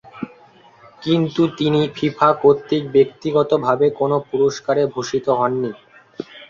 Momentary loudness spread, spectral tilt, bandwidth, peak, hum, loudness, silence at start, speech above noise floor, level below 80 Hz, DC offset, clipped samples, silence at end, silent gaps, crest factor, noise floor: 13 LU; -6.5 dB/octave; 7.4 kHz; -2 dBFS; none; -18 LUFS; 0.15 s; 31 dB; -58 dBFS; under 0.1%; under 0.1%; 0.05 s; none; 16 dB; -48 dBFS